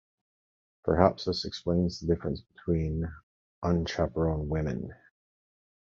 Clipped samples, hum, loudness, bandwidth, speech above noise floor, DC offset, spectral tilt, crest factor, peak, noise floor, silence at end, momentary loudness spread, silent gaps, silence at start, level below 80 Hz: under 0.1%; none; -30 LUFS; 7.6 kHz; over 61 dB; under 0.1%; -7 dB/octave; 26 dB; -4 dBFS; under -90 dBFS; 1 s; 12 LU; 3.23-3.62 s; 0.85 s; -42 dBFS